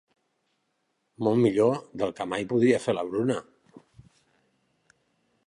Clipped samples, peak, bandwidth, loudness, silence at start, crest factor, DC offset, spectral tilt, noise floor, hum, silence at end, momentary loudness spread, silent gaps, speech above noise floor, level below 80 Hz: under 0.1%; -10 dBFS; 11 kHz; -26 LUFS; 1.2 s; 20 dB; under 0.1%; -6.5 dB/octave; -76 dBFS; none; 2.05 s; 9 LU; none; 51 dB; -68 dBFS